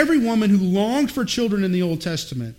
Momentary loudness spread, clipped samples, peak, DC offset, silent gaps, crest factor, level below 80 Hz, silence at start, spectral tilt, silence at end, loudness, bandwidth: 7 LU; under 0.1%; -4 dBFS; under 0.1%; none; 16 dB; -50 dBFS; 0 s; -5.5 dB/octave; 0.05 s; -20 LUFS; 16.5 kHz